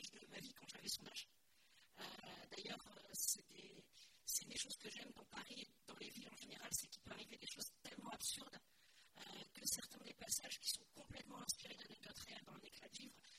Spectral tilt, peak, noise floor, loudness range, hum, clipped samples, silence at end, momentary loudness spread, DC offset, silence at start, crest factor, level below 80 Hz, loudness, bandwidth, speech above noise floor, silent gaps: -0.5 dB/octave; -28 dBFS; -76 dBFS; 3 LU; none; under 0.1%; 0 s; 15 LU; under 0.1%; 0 s; 26 dB; -80 dBFS; -49 LUFS; 16 kHz; 22 dB; none